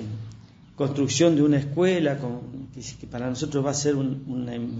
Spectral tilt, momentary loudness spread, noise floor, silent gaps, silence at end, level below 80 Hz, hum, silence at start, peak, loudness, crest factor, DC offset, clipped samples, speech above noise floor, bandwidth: -5.5 dB/octave; 18 LU; -47 dBFS; none; 0 s; -56 dBFS; none; 0 s; -8 dBFS; -24 LUFS; 18 dB; under 0.1%; under 0.1%; 22 dB; 8 kHz